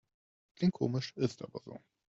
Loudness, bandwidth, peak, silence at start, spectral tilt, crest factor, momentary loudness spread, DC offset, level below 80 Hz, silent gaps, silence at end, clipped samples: -35 LUFS; 7.8 kHz; -18 dBFS; 0.6 s; -7 dB/octave; 20 dB; 18 LU; under 0.1%; -72 dBFS; none; 0.4 s; under 0.1%